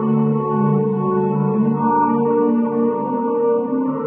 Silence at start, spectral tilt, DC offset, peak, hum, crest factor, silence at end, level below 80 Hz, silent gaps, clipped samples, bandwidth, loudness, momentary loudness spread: 0 s; -13.5 dB/octave; under 0.1%; -6 dBFS; none; 12 dB; 0 s; -62 dBFS; none; under 0.1%; 3.1 kHz; -18 LUFS; 3 LU